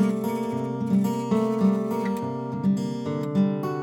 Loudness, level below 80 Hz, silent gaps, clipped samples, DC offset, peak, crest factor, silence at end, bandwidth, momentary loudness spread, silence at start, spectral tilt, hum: -25 LUFS; -72 dBFS; none; under 0.1%; under 0.1%; -10 dBFS; 14 dB; 0 s; 17 kHz; 6 LU; 0 s; -8 dB/octave; none